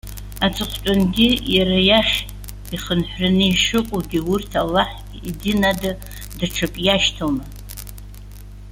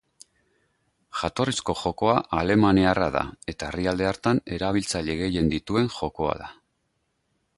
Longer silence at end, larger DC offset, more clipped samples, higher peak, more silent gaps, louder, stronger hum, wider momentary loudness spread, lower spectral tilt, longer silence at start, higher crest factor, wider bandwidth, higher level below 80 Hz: second, 0 s vs 1.05 s; neither; neither; first, -2 dBFS vs -6 dBFS; neither; first, -19 LUFS vs -25 LUFS; first, 50 Hz at -35 dBFS vs none; first, 19 LU vs 11 LU; about the same, -4.5 dB/octave vs -5.5 dB/octave; second, 0.05 s vs 1.15 s; about the same, 18 dB vs 20 dB; first, 17 kHz vs 11.5 kHz; first, -34 dBFS vs -44 dBFS